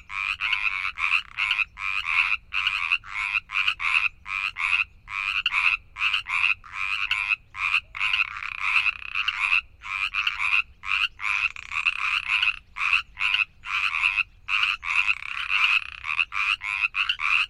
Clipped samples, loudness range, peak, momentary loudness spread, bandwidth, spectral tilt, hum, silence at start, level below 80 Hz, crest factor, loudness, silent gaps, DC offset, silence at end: under 0.1%; 1 LU; -6 dBFS; 5 LU; 13 kHz; 1.5 dB/octave; none; 0.1 s; -54 dBFS; 20 dB; -23 LUFS; none; under 0.1%; 0 s